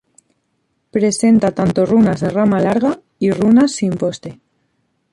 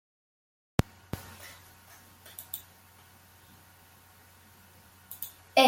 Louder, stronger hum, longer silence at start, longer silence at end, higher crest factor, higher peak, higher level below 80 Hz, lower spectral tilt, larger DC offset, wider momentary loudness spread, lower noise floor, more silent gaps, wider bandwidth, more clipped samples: first, -15 LUFS vs -37 LUFS; neither; second, 0.95 s vs 1.15 s; first, 0.8 s vs 0 s; second, 12 dB vs 30 dB; about the same, -4 dBFS vs -6 dBFS; first, -50 dBFS vs -56 dBFS; first, -6.5 dB/octave vs -4 dB/octave; neither; second, 9 LU vs 23 LU; first, -67 dBFS vs -57 dBFS; neither; second, 11.5 kHz vs 17 kHz; neither